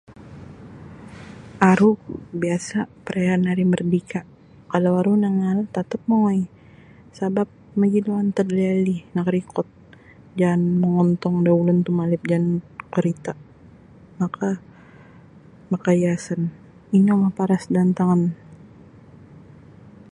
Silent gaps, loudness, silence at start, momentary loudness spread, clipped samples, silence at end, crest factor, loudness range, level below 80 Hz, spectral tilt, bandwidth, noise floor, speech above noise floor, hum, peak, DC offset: none; -21 LUFS; 0.1 s; 15 LU; under 0.1%; 1.55 s; 22 dB; 5 LU; -58 dBFS; -8 dB/octave; 10.5 kHz; -47 dBFS; 28 dB; none; 0 dBFS; under 0.1%